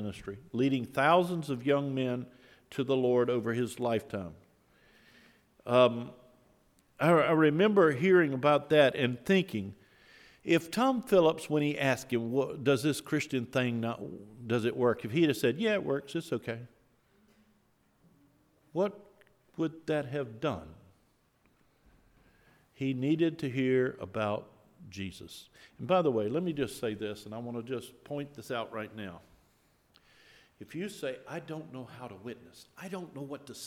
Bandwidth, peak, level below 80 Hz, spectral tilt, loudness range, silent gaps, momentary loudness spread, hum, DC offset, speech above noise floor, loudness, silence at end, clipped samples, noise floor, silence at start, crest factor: 16.5 kHz; -10 dBFS; -70 dBFS; -6 dB/octave; 15 LU; none; 19 LU; none; under 0.1%; 39 dB; -30 LUFS; 0 s; under 0.1%; -70 dBFS; 0 s; 22 dB